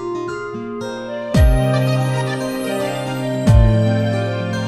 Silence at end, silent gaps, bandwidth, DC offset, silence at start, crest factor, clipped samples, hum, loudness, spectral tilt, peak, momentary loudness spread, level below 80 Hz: 0 s; none; 14 kHz; under 0.1%; 0 s; 16 dB; under 0.1%; none; -18 LUFS; -7 dB/octave; 0 dBFS; 13 LU; -22 dBFS